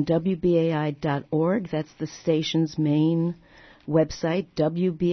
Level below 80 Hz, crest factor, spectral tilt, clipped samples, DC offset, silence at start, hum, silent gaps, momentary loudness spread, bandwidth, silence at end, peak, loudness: -54 dBFS; 16 dB; -7 dB/octave; under 0.1%; under 0.1%; 0 s; none; none; 8 LU; 6.4 kHz; 0 s; -8 dBFS; -25 LUFS